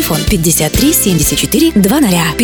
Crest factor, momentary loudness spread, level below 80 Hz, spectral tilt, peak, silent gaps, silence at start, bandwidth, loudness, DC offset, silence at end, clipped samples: 10 dB; 2 LU; -24 dBFS; -4 dB/octave; 0 dBFS; none; 0 s; over 20 kHz; -10 LUFS; under 0.1%; 0 s; under 0.1%